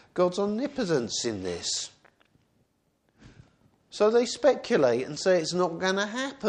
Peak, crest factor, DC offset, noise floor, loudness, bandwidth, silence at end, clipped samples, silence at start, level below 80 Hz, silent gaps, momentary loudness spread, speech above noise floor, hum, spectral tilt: -10 dBFS; 18 dB; under 0.1%; -71 dBFS; -26 LUFS; 10 kHz; 0 s; under 0.1%; 0.15 s; -66 dBFS; none; 8 LU; 45 dB; none; -4 dB/octave